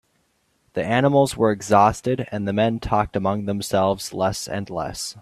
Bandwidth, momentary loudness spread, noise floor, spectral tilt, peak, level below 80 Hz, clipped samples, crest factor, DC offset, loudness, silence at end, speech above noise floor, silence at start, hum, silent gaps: 14 kHz; 11 LU; -67 dBFS; -5.5 dB/octave; -2 dBFS; -46 dBFS; under 0.1%; 20 dB; under 0.1%; -21 LUFS; 0 s; 46 dB; 0.75 s; none; none